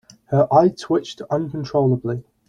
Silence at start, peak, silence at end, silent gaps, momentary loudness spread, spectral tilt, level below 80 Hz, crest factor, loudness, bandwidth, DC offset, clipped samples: 0.3 s; -2 dBFS; 0.3 s; none; 9 LU; -8 dB/octave; -56 dBFS; 18 dB; -20 LUFS; 9.6 kHz; under 0.1%; under 0.1%